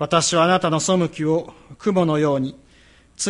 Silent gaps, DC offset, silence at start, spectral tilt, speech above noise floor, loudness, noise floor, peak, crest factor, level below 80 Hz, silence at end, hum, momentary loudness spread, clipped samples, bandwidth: none; under 0.1%; 0 s; -4.5 dB/octave; 32 dB; -20 LUFS; -52 dBFS; -2 dBFS; 18 dB; -54 dBFS; 0 s; none; 9 LU; under 0.1%; 11.5 kHz